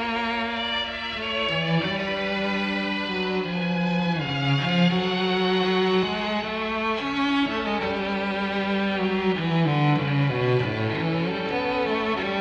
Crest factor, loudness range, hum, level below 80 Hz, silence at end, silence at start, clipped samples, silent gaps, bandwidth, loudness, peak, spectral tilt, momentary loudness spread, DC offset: 14 dB; 2 LU; none; -52 dBFS; 0 s; 0 s; under 0.1%; none; 8 kHz; -24 LUFS; -10 dBFS; -6.5 dB/octave; 4 LU; under 0.1%